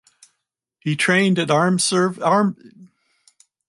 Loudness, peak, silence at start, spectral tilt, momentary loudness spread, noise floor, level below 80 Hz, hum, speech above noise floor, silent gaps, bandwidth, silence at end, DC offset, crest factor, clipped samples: -18 LUFS; -4 dBFS; 0.85 s; -4.5 dB/octave; 7 LU; -78 dBFS; -68 dBFS; none; 60 dB; none; 11.5 kHz; 0.85 s; under 0.1%; 16 dB; under 0.1%